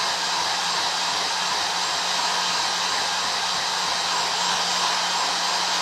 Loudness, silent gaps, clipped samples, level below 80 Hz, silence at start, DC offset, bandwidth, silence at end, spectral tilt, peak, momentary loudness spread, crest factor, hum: -22 LUFS; none; under 0.1%; -66 dBFS; 0 s; under 0.1%; 16 kHz; 0 s; 0.5 dB/octave; -10 dBFS; 1 LU; 14 dB; none